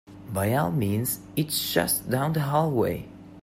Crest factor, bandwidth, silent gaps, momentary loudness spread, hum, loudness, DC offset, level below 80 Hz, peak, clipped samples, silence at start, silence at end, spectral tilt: 18 dB; 16 kHz; none; 5 LU; none; -26 LUFS; under 0.1%; -54 dBFS; -8 dBFS; under 0.1%; 0.1 s; 0.05 s; -5 dB/octave